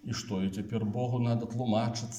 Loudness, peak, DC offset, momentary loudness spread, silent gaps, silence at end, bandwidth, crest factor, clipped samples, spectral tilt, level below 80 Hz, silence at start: -32 LUFS; -16 dBFS; under 0.1%; 4 LU; none; 0 s; 12 kHz; 16 dB; under 0.1%; -6.5 dB/octave; -64 dBFS; 0.05 s